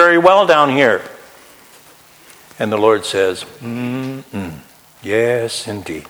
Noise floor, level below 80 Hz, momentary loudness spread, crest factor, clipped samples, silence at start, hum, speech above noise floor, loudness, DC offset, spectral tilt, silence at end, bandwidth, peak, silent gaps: -45 dBFS; -56 dBFS; 17 LU; 16 dB; under 0.1%; 0 s; none; 30 dB; -15 LUFS; under 0.1%; -4.5 dB/octave; 0.05 s; over 20 kHz; 0 dBFS; none